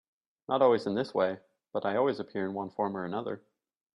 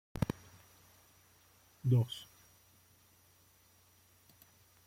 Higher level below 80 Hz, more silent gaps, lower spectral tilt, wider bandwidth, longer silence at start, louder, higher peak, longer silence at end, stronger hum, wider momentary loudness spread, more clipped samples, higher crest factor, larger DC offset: second, -76 dBFS vs -62 dBFS; neither; about the same, -7.5 dB/octave vs -7 dB/octave; second, 10.5 kHz vs 16.5 kHz; first, 0.5 s vs 0.15 s; first, -31 LUFS vs -36 LUFS; first, -12 dBFS vs -16 dBFS; second, 0.55 s vs 2.65 s; neither; second, 14 LU vs 29 LU; neither; about the same, 20 dB vs 24 dB; neither